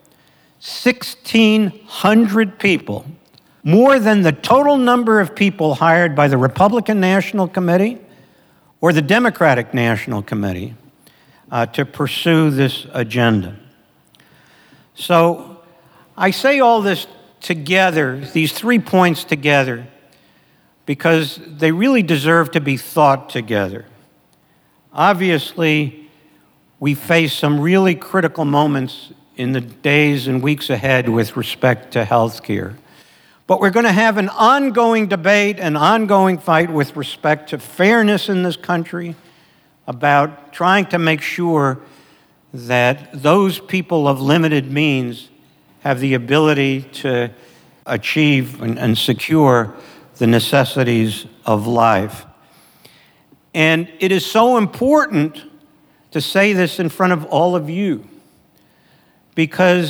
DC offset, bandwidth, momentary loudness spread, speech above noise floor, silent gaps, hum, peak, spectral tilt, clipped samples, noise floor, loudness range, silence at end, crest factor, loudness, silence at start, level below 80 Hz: under 0.1%; over 20 kHz; 11 LU; 41 dB; none; none; 0 dBFS; -6 dB/octave; under 0.1%; -56 dBFS; 4 LU; 0 s; 16 dB; -15 LUFS; 0.65 s; -60 dBFS